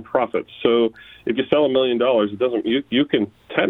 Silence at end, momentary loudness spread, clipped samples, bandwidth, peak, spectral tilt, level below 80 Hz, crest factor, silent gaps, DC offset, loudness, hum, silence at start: 0 s; 6 LU; under 0.1%; 4.2 kHz; -2 dBFS; -8 dB/octave; -58 dBFS; 18 dB; none; under 0.1%; -20 LUFS; none; 0 s